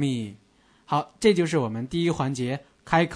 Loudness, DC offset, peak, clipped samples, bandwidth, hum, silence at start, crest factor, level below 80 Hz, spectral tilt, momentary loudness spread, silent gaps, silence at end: -25 LUFS; under 0.1%; -6 dBFS; under 0.1%; 11 kHz; none; 0 s; 20 dB; -56 dBFS; -6 dB/octave; 10 LU; none; 0 s